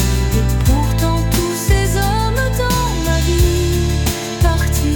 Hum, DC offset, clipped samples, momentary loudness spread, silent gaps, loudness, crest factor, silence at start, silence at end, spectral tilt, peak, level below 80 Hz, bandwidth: none; under 0.1%; under 0.1%; 2 LU; none; -16 LUFS; 12 dB; 0 s; 0 s; -5 dB/octave; -2 dBFS; -18 dBFS; 19 kHz